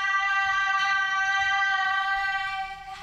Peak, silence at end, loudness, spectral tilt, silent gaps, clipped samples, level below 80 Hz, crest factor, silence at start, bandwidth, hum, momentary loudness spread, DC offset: -12 dBFS; 0 s; -24 LUFS; 1 dB/octave; none; under 0.1%; -56 dBFS; 12 dB; 0 s; 13.5 kHz; none; 7 LU; under 0.1%